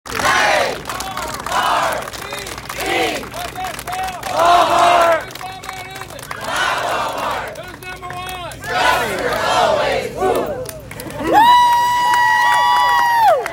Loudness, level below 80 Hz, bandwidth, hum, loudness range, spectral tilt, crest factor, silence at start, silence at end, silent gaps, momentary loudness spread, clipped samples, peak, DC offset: -16 LUFS; -44 dBFS; 17 kHz; none; 7 LU; -2.5 dB/octave; 16 dB; 0.05 s; 0 s; none; 17 LU; under 0.1%; 0 dBFS; under 0.1%